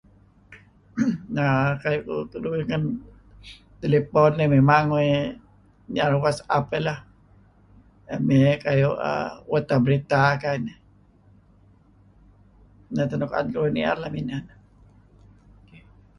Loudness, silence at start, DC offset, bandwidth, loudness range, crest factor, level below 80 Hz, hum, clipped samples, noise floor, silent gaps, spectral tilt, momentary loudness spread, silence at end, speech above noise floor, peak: -23 LUFS; 0.5 s; under 0.1%; 11 kHz; 7 LU; 20 dB; -52 dBFS; none; under 0.1%; -56 dBFS; none; -7.5 dB/octave; 13 LU; 1.7 s; 34 dB; -4 dBFS